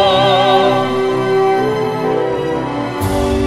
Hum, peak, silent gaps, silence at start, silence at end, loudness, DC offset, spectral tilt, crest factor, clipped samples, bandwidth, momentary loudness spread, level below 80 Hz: none; 0 dBFS; none; 0 s; 0 s; -14 LUFS; under 0.1%; -5.5 dB/octave; 14 dB; under 0.1%; 15.5 kHz; 8 LU; -34 dBFS